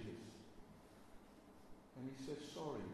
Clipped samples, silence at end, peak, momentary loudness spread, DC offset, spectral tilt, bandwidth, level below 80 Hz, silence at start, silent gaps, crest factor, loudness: under 0.1%; 0 s; -34 dBFS; 16 LU; under 0.1%; -5.5 dB/octave; 13 kHz; -72 dBFS; 0 s; none; 18 dB; -53 LUFS